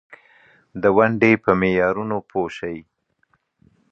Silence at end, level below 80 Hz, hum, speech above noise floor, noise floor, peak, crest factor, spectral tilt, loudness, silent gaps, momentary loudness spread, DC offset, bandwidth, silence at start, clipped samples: 1.1 s; -52 dBFS; none; 47 dB; -66 dBFS; -2 dBFS; 20 dB; -8 dB/octave; -19 LUFS; none; 15 LU; under 0.1%; 7.8 kHz; 0.1 s; under 0.1%